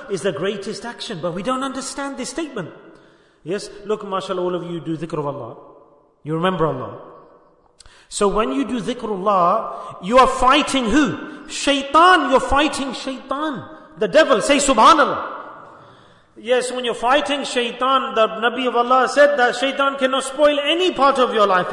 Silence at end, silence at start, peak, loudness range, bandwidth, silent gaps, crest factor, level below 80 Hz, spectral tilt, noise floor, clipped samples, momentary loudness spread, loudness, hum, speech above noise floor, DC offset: 0 s; 0 s; -2 dBFS; 11 LU; 11 kHz; none; 16 dB; -44 dBFS; -3.5 dB/octave; -52 dBFS; under 0.1%; 16 LU; -18 LUFS; none; 34 dB; under 0.1%